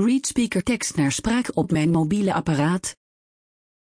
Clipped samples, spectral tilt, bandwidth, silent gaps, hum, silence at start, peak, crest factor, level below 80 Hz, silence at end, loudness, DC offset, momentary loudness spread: under 0.1%; -5 dB/octave; 10.5 kHz; none; none; 0 s; -10 dBFS; 12 dB; -48 dBFS; 0.95 s; -22 LUFS; under 0.1%; 3 LU